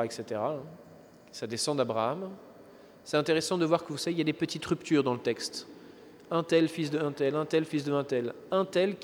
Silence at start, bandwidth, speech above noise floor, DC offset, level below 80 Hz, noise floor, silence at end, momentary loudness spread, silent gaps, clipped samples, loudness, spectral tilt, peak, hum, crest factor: 0 s; 19.5 kHz; 24 dB; under 0.1%; -72 dBFS; -54 dBFS; 0 s; 14 LU; none; under 0.1%; -30 LUFS; -5 dB/octave; -12 dBFS; none; 20 dB